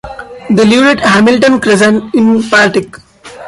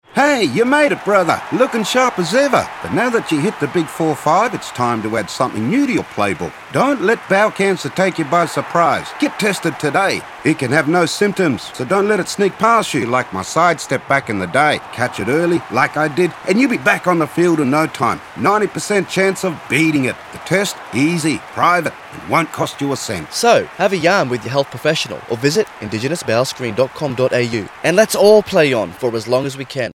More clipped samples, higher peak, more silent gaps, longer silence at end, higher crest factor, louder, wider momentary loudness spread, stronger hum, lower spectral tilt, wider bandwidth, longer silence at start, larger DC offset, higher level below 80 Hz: neither; about the same, 0 dBFS vs 0 dBFS; neither; about the same, 0 s vs 0 s; second, 10 dB vs 16 dB; first, -8 LUFS vs -16 LUFS; first, 12 LU vs 6 LU; neither; about the same, -5 dB/octave vs -4.5 dB/octave; second, 11.5 kHz vs 16.5 kHz; about the same, 0.05 s vs 0.15 s; neither; first, -44 dBFS vs -56 dBFS